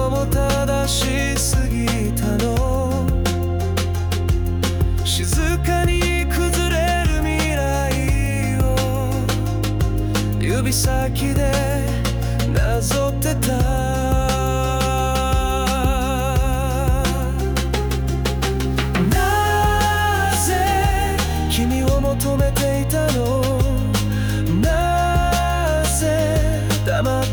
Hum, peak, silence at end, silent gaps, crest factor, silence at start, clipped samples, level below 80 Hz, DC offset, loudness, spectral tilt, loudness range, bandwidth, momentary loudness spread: none; -6 dBFS; 0 s; none; 12 dB; 0 s; under 0.1%; -24 dBFS; under 0.1%; -19 LUFS; -5 dB/octave; 2 LU; over 20 kHz; 3 LU